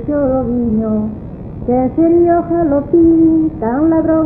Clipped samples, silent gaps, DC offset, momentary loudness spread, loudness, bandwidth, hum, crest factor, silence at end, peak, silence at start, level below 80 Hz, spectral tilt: under 0.1%; none; under 0.1%; 10 LU; -13 LUFS; 2.5 kHz; none; 12 dB; 0 s; -2 dBFS; 0 s; -34 dBFS; -13.5 dB/octave